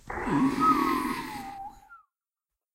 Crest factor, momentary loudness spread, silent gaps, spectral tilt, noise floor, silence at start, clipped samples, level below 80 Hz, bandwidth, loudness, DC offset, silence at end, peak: 18 dB; 19 LU; none; -5.5 dB/octave; under -90 dBFS; 0.05 s; under 0.1%; -52 dBFS; 16 kHz; -26 LUFS; under 0.1%; 0.8 s; -10 dBFS